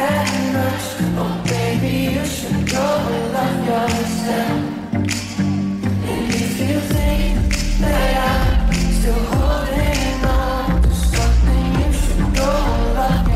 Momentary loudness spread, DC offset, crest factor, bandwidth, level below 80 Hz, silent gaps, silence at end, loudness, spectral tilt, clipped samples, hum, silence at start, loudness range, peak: 4 LU; under 0.1%; 10 dB; 15.5 kHz; -20 dBFS; none; 0 s; -19 LUFS; -5.5 dB/octave; under 0.1%; none; 0 s; 2 LU; -6 dBFS